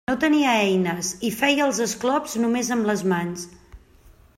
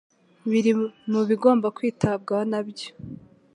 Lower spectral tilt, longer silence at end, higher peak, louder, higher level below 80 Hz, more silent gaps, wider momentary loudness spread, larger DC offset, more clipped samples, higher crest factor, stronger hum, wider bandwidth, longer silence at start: second, -4 dB/octave vs -7 dB/octave; first, 0.6 s vs 0.4 s; about the same, -6 dBFS vs -4 dBFS; about the same, -22 LUFS vs -23 LUFS; first, -54 dBFS vs -60 dBFS; neither; second, 7 LU vs 17 LU; neither; neither; about the same, 16 dB vs 20 dB; neither; first, 16 kHz vs 10.5 kHz; second, 0.1 s vs 0.45 s